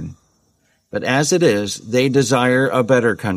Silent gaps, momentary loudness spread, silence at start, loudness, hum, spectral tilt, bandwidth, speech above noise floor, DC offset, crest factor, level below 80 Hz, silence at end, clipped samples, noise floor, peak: none; 8 LU; 0 s; -16 LUFS; none; -4.5 dB/octave; 15 kHz; 46 dB; under 0.1%; 14 dB; -54 dBFS; 0 s; under 0.1%; -62 dBFS; -2 dBFS